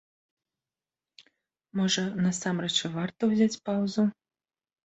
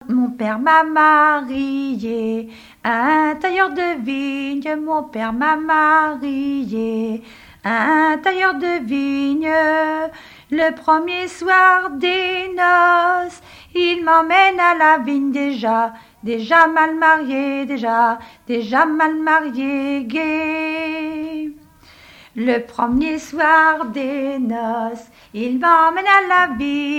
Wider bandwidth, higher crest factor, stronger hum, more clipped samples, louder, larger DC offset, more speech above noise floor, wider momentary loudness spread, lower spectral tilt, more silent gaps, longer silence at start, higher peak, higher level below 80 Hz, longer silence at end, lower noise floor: second, 8.2 kHz vs 15.5 kHz; about the same, 18 dB vs 18 dB; neither; neither; second, -28 LUFS vs -17 LUFS; neither; first, over 63 dB vs 29 dB; second, 5 LU vs 12 LU; about the same, -4.5 dB/octave vs -4.5 dB/octave; neither; first, 1.75 s vs 0.05 s; second, -12 dBFS vs 0 dBFS; second, -70 dBFS vs -52 dBFS; first, 0.75 s vs 0 s; first, under -90 dBFS vs -46 dBFS